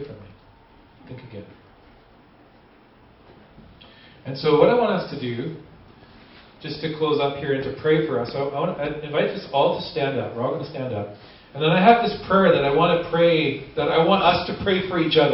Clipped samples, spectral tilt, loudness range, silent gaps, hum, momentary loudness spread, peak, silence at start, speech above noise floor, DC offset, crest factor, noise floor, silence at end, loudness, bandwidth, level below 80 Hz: under 0.1%; -10.5 dB/octave; 7 LU; none; none; 20 LU; -2 dBFS; 0 s; 31 dB; under 0.1%; 20 dB; -52 dBFS; 0 s; -21 LUFS; 5.8 kHz; -52 dBFS